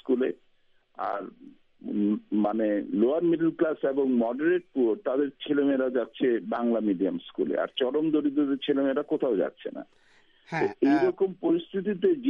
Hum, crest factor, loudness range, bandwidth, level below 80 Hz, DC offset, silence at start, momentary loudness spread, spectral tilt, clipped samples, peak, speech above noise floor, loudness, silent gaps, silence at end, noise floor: none; 14 dB; 2 LU; 6.6 kHz; -72 dBFS; under 0.1%; 0.05 s; 8 LU; -8 dB/octave; under 0.1%; -12 dBFS; 37 dB; -27 LUFS; none; 0 s; -63 dBFS